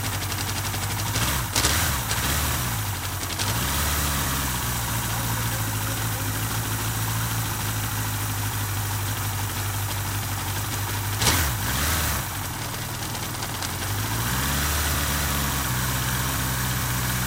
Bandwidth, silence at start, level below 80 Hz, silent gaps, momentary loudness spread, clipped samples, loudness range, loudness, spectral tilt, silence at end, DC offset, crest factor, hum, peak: 16 kHz; 0 s; -34 dBFS; none; 5 LU; under 0.1%; 2 LU; -25 LUFS; -3 dB/octave; 0 s; under 0.1%; 20 dB; none; -6 dBFS